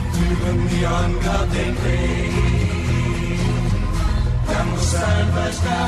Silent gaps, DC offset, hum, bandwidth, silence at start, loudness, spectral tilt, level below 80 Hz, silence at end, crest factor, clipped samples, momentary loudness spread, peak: none; under 0.1%; none; 13 kHz; 0 s; -20 LUFS; -6 dB/octave; -24 dBFS; 0 s; 12 dB; under 0.1%; 3 LU; -8 dBFS